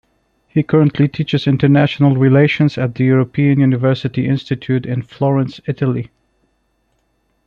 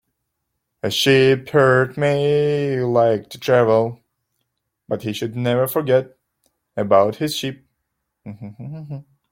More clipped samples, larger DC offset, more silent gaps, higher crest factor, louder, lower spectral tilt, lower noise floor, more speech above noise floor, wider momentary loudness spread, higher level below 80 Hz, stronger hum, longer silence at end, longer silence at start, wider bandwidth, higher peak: neither; neither; neither; about the same, 14 dB vs 18 dB; first, -15 LUFS vs -18 LUFS; first, -9 dB/octave vs -5.5 dB/octave; second, -63 dBFS vs -76 dBFS; second, 49 dB vs 58 dB; second, 8 LU vs 19 LU; first, -52 dBFS vs -60 dBFS; neither; first, 1.4 s vs 0.3 s; second, 0.55 s vs 0.85 s; second, 6.4 kHz vs 16.5 kHz; about the same, -2 dBFS vs -2 dBFS